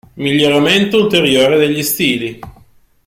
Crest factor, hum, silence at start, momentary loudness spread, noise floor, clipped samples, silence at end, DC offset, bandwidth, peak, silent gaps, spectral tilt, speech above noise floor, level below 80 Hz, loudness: 12 dB; none; 0.15 s; 6 LU; -47 dBFS; under 0.1%; 0.55 s; under 0.1%; 16.5 kHz; 0 dBFS; none; -4 dB/octave; 35 dB; -48 dBFS; -12 LUFS